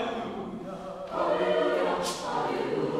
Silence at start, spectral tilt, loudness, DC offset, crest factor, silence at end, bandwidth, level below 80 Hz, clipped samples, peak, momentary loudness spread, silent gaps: 0 s; -4.5 dB/octave; -30 LUFS; under 0.1%; 14 dB; 0 s; 15 kHz; -60 dBFS; under 0.1%; -14 dBFS; 12 LU; none